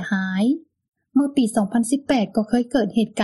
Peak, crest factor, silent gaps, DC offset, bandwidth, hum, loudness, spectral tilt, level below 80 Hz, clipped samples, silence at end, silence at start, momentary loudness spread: -8 dBFS; 14 dB; 0.88-0.92 s; under 0.1%; 12 kHz; none; -21 LUFS; -5.5 dB/octave; -56 dBFS; under 0.1%; 0 s; 0 s; 3 LU